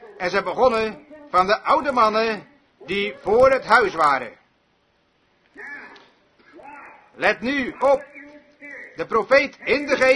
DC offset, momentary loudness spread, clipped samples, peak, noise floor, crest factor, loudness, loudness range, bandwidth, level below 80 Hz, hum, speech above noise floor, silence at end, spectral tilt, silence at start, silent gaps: under 0.1%; 21 LU; under 0.1%; -2 dBFS; -64 dBFS; 20 dB; -20 LUFS; 9 LU; 11 kHz; -54 dBFS; none; 45 dB; 0 s; -4.5 dB/octave; 0.05 s; none